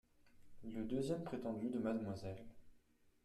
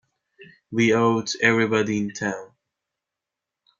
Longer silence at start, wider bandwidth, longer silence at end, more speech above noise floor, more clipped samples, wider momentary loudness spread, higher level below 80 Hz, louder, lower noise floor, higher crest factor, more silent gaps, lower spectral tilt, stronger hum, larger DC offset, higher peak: second, 0.25 s vs 0.4 s; first, 13 kHz vs 7.6 kHz; second, 0.45 s vs 1.35 s; second, 29 dB vs 65 dB; neither; first, 14 LU vs 11 LU; about the same, -68 dBFS vs -64 dBFS; second, -44 LUFS vs -22 LUFS; second, -72 dBFS vs -86 dBFS; about the same, 16 dB vs 20 dB; neither; first, -7.5 dB/octave vs -5 dB/octave; neither; neither; second, -28 dBFS vs -4 dBFS